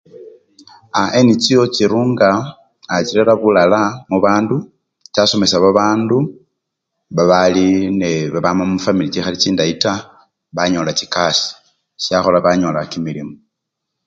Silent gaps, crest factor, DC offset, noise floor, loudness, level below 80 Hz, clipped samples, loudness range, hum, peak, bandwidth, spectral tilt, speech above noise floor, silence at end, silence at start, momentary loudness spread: none; 16 dB; under 0.1%; -77 dBFS; -15 LUFS; -48 dBFS; under 0.1%; 3 LU; none; 0 dBFS; 9.2 kHz; -5 dB/octave; 63 dB; 0.7 s; 0.15 s; 11 LU